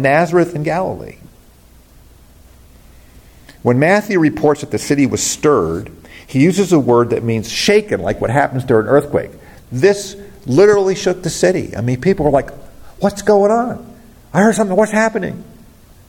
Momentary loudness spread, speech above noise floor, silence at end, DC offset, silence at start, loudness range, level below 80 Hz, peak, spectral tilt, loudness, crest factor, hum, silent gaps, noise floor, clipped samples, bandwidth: 11 LU; 31 dB; 0.65 s; under 0.1%; 0 s; 4 LU; -42 dBFS; 0 dBFS; -5.5 dB/octave; -15 LUFS; 14 dB; none; none; -45 dBFS; under 0.1%; 17 kHz